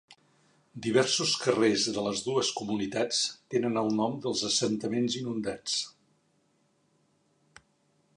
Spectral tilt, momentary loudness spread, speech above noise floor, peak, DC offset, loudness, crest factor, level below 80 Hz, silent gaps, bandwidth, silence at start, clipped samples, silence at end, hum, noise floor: -3.5 dB/octave; 7 LU; 42 dB; -10 dBFS; under 0.1%; -28 LUFS; 22 dB; -68 dBFS; none; 11 kHz; 0.1 s; under 0.1%; 2.25 s; none; -71 dBFS